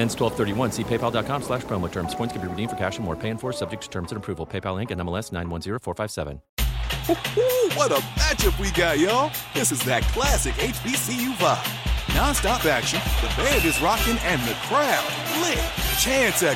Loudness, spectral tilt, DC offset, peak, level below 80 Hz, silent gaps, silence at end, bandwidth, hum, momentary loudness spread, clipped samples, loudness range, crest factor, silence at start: -23 LUFS; -3.5 dB/octave; under 0.1%; -6 dBFS; -32 dBFS; 6.49-6.57 s; 0 s; 17 kHz; none; 9 LU; under 0.1%; 8 LU; 18 dB; 0 s